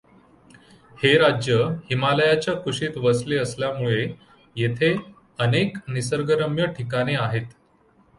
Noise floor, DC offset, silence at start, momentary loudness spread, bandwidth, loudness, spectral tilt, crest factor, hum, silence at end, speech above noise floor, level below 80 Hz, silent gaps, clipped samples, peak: -59 dBFS; under 0.1%; 0.95 s; 9 LU; 11.5 kHz; -22 LUFS; -5.5 dB/octave; 18 dB; none; 0.7 s; 37 dB; -56 dBFS; none; under 0.1%; -4 dBFS